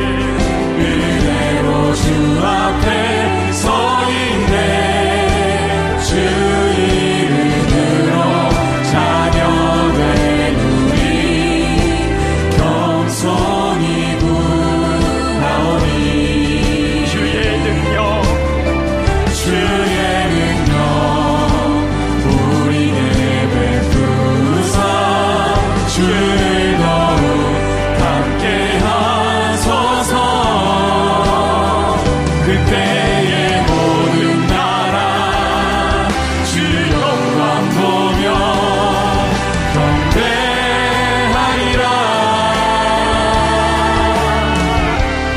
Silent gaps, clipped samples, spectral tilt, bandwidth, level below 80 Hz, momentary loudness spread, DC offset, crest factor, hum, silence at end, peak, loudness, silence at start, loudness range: none; under 0.1%; -5.5 dB/octave; 15 kHz; -24 dBFS; 2 LU; under 0.1%; 14 dB; none; 0 s; 0 dBFS; -14 LUFS; 0 s; 1 LU